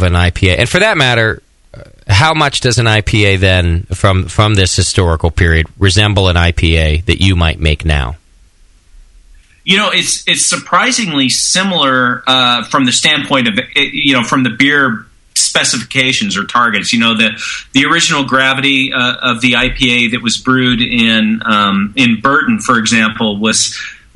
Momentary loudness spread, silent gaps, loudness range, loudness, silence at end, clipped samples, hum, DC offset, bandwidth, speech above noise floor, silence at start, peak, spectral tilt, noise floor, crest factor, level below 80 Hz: 4 LU; none; 3 LU; -10 LUFS; 0.2 s; 0.1%; none; under 0.1%; 12 kHz; 34 dB; 0 s; 0 dBFS; -3.5 dB/octave; -45 dBFS; 12 dB; -26 dBFS